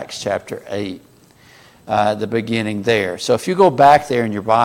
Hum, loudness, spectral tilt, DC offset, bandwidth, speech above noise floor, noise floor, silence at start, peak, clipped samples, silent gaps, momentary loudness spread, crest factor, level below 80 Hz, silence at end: none; -17 LUFS; -5 dB/octave; under 0.1%; 16.5 kHz; 31 dB; -48 dBFS; 0 s; 0 dBFS; under 0.1%; none; 15 LU; 16 dB; -56 dBFS; 0 s